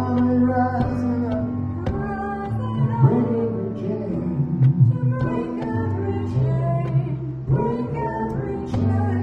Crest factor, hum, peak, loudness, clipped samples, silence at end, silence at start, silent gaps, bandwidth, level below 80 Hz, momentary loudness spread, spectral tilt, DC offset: 18 dB; none; -4 dBFS; -22 LUFS; under 0.1%; 0 s; 0 s; none; 5.4 kHz; -42 dBFS; 8 LU; -10.5 dB/octave; under 0.1%